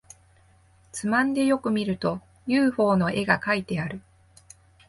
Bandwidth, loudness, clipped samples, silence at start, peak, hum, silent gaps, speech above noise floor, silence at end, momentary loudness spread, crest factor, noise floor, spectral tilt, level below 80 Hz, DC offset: 11.5 kHz; -24 LUFS; under 0.1%; 0.95 s; -6 dBFS; none; none; 34 dB; 0.9 s; 12 LU; 20 dB; -58 dBFS; -6 dB/octave; -58 dBFS; under 0.1%